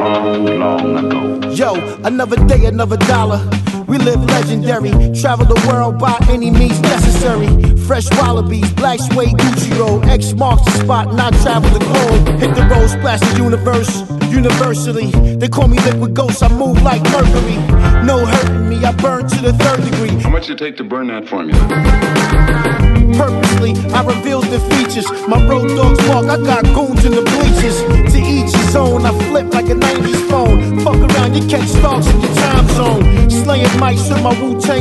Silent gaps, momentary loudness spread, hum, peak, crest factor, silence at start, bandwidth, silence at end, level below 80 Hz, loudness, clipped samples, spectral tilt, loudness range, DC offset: none; 4 LU; none; 0 dBFS; 10 dB; 0 s; 12.5 kHz; 0 s; -16 dBFS; -12 LUFS; under 0.1%; -6 dB/octave; 2 LU; under 0.1%